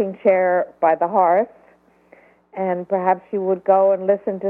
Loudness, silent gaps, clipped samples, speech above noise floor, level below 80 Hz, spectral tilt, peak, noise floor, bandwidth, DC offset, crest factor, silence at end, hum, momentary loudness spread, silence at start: -19 LUFS; none; under 0.1%; 36 dB; -68 dBFS; -10.5 dB/octave; -4 dBFS; -54 dBFS; 3.3 kHz; under 0.1%; 16 dB; 0 s; none; 8 LU; 0 s